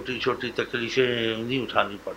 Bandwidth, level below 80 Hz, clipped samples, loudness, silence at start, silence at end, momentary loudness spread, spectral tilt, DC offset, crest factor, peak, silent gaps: 16 kHz; -56 dBFS; under 0.1%; -26 LUFS; 0 s; 0 s; 5 LU; -5 dB/octave; under 0.1%; 22 dB; -4 dBFS; none